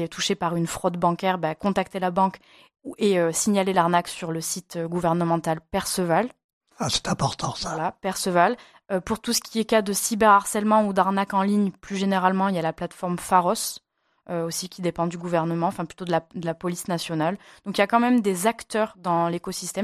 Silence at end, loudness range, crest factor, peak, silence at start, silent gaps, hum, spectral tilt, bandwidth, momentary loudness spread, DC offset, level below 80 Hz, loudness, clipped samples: 0 s; 5 LU; 20 dB; -4 dBFS; 0 s; 6.44-6.61 s; none; -4.5 dB/octave; 15 kHz; 9 LU; under 0.1%; -56 dBFS; -24 LUFS; under 0.1%